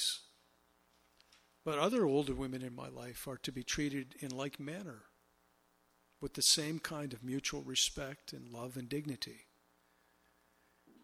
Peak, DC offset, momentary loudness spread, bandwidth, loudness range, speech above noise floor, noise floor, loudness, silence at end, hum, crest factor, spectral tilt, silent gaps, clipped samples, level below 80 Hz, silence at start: -16 dBFS; under 0.1%; 15 LU; 16 kHz; 7 LU; 35 dB; -73 dBFS; -37 LUFS; 1.65 s; none; 24 dB; -3 dB/octave; none; under 0.1%; -62 dBFS; 0 s